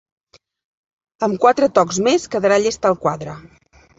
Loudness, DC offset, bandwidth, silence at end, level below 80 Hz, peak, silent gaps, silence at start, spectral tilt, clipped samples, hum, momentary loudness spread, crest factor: -17 LUFS; under 0.1%; 8 kHz; 0.6 s; -56 dBFS; 0 dBFS; none; 1.2 s; -4.5 dB/octave; under 0.1%; none; 12 LU; 18 dB